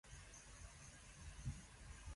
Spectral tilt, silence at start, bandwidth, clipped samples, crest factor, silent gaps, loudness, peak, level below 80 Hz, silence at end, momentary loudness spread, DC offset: -4 dB/octave; 0.05 s; 11.5 kHz; under 0.1%; 18 dB; none; -57 LUFS; -38 dBFS; -58 dBFS; 0 s; 6 LU; under 0.1%